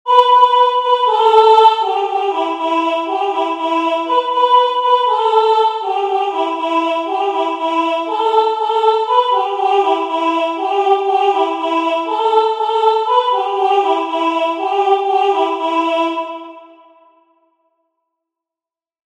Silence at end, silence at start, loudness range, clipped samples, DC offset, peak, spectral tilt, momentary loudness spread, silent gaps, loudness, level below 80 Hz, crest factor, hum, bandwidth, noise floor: 2.45 s; 0.05 s; 4 LU; under 0.1%; under 0.1%; 0 dBFS; -1.5 dB/octave; 7 LU; none; -14 LUFS; -72 dBFS; 14 dB; none; 9.8 kHz; -89 dBFS